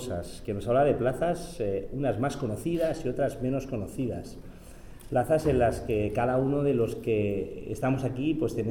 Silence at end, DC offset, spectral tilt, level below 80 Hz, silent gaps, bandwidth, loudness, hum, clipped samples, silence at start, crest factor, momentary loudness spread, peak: 0 s; under 0.1%; -7.5 dB/octave; -46 dBFS; none; 18.5 kHz; -29 LUFS; none; under 0.1%; 0 s; 14 dB; 10 LU; -14 dBFS